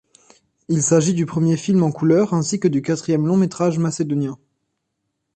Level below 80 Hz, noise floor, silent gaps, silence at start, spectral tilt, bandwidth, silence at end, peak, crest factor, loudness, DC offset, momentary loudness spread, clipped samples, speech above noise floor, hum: -60 dBFS; -75 dBFS; none; 0.7 s; -6.5 dB/octave; 9 kHz; 1 s; -4 dBFS; 16 dB; -19 LUFS; under 0.1%; 6 LU; under 0.1%; 57 dB; none